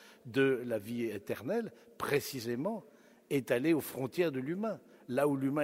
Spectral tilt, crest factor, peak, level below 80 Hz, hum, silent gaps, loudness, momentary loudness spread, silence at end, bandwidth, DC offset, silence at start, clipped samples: -6 dB/octave; 20 dB; -14 dBFS; -74 dBFS; none; none; -34 LUFS; 9 LU; 0 s; 16 kHz; under 0.1%; 0 s; under 0.1%